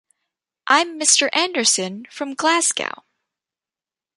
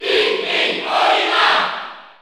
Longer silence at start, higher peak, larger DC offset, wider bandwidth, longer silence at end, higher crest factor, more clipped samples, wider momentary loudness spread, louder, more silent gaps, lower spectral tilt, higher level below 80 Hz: first, 0.65 s vs 0 s; about the same, 0 dBFS vs -2 dBFS; neither; second, 11.5 kHz vs 15.5 kHz; first, 1.25 s vs 0.15 s; about the same, 20 dB vs 16 dB; neither; first, 15 LU vs 10 LU; about the same, -17 LUFS vs -15 LUFS; neither; about the same, -0.5 dB/octave vs -1.5 dB/octave; second, -78 dBFS vs -64 dBFS